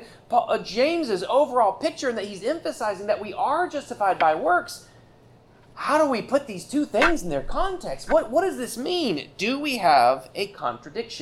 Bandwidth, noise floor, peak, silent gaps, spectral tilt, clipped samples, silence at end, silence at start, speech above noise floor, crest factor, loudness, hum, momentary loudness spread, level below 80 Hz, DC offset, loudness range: 15 kHz; -53 dBFS; -6 dBFS; none; -4 dB/octave; under 0.1%; 0 s; 0 s; 29 dB; 18 dB; -24 LUFS; none; 9 LU; -44 dBFS; under 0.1%; 2 LU